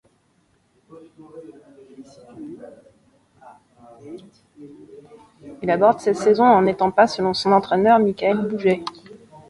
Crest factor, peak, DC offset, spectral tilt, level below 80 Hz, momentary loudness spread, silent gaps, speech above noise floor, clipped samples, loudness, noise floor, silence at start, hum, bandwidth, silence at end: 20 dB; -2 dBFS; under 0.1%; -6 dB/octave; -60 dBFS; 25 LU; none; 44 dB; under 0.1%; -18 LUFS; -63 dBFS; 1.35 s; none; 11.5 kHz; 0.6 s